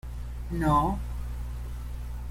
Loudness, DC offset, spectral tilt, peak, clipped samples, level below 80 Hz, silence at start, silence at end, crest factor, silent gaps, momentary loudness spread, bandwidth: -31 LUFS; under 0.1%; -7.5 dB/octave; -12 dBFS; under 0.1%; -34 dBFS; 0.05 s; 0 s; 18 dB; none; 14 LU; 16 kHz